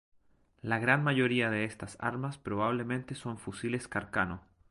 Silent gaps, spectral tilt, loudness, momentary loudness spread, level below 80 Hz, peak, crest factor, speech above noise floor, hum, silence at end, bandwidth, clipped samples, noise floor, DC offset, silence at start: none; -6 dB/octave; -32 LUFS; 13 LU; -60 dBFS; -10 dBFS; 22 dB; 34 dB; none; 0.3 s; 11.5 kHz; under 0.1%; -66 dBFS; under 0.1%; 0.65 s